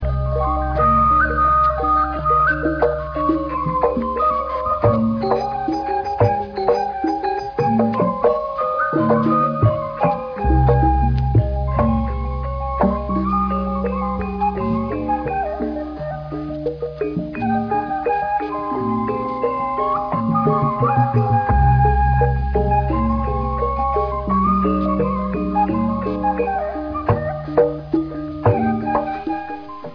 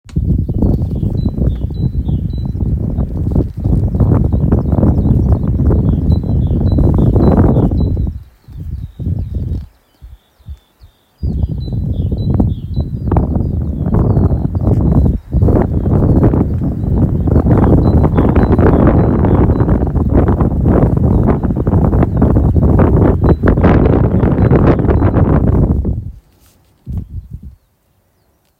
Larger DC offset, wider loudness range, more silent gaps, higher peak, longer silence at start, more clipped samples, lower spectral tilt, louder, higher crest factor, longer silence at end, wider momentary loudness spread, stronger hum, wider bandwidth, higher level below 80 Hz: neither; second, 5 LU vs 9 LU; neither; second, -4 dBFS vs 0 dBFS; about the same, 0 s vs 0.05 s; neither; second, -10 dB/octave vs -11.5 dB/octave; second, -19 LUFS vs -13 LUFS; about the same, 16 dB vs 12 dB; second, 0 s vs 1.1 s; about the same, 8 LU vs 10 LU; neither; first, 5.4 kHz vs 4.3 kHz; second, -28 dBFS vs -18 dBFS